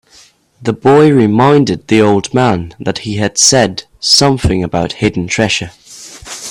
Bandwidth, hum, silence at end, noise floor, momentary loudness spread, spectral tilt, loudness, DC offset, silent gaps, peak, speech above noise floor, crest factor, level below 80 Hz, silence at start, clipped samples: over 20 kHz; none; 0 s; -45 dBFS; 15 LU; -4 dB/octave; -11 LUFS; under 0.1%; none; 0 dBFS; 34 dB; 12 dB; -36 dBFS; 0.6 s; under 0.1%